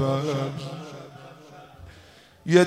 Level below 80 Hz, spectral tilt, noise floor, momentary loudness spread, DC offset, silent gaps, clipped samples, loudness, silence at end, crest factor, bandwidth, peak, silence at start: -60 dBFS; -6 dB/octave; -52 dBFS; 22 LU; under 0.1%; none; under 0.1%; -28 LUFS; 0 s; 22 dB; 12.5 kHz; -4 dBFS; 0 s